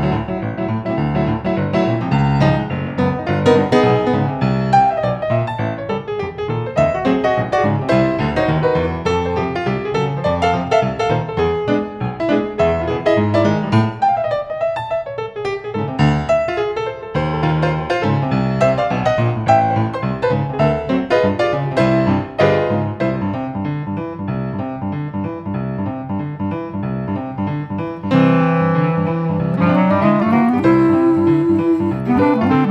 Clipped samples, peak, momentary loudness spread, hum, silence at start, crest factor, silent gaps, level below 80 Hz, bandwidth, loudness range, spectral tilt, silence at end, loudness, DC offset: under 0.1%; 0 dBFS; 9 LU; none; 0 s; 16 dB; none; -40 dBFS; 9 kHz; 5 LU; -8 dB/octave; 0 s; -17 LUFS; under 0.1%